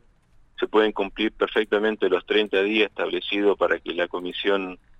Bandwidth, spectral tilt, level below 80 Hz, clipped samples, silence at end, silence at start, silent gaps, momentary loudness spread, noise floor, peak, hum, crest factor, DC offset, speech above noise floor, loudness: 6.8 kHz; -5.5 dB/octave; -54 dBFS; under 0.1%; 0.25 s; 0.6 s; none; 6 LU; -56 dBFS; -6 dBFS; none; 16 dB; under 0.1%; 33 dB; -23 LUFS